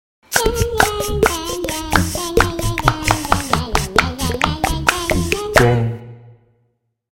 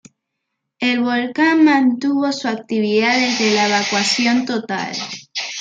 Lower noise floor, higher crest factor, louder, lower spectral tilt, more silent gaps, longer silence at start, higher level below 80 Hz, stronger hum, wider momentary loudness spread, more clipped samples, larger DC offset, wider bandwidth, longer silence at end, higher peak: second, -66 dBFS vs -77 dBFS; about the same, 18 dB vs 16 dB; about the same, -17 LUFS vs -17 LUFS; about the same, -4 dB/octave vs -3 dB/octave; neither; second, 0.3 s vs 0.8 s; first, -28 dBFS vs -68 dBFS; neither; second, 5 LU vs 10 LU; neither; first, 0.2% vs under 0.1%; first, 17 kHz vs 9.4 kHz; first, 0.8 s vs 0 s; about the same, 0 dBFS vs -2 dBFS